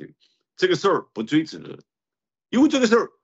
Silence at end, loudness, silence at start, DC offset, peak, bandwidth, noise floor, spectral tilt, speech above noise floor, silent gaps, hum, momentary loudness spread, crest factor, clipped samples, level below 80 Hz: 0.15 s; -21 LUFS; 0 s; under 0.1%; -4 dBFS; 8 kHz; under -90 dBFS; -5 dB/octave; over 69 dB; none; none; 16 LU; 18 dB; under 0.1%; -72 dBFS